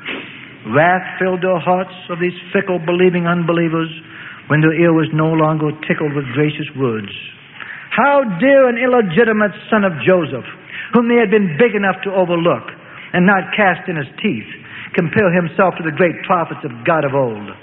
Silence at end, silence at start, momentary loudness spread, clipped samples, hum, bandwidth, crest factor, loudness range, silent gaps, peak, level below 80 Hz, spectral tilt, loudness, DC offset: 0.05 s; 0 s; 15 LU; under 0.1%; none; 4 kHz; 16 dB; 3 LU; none; 0 dBFS; -56 dBFS; -11 dB/octave; -15 LUFS; under 0.1%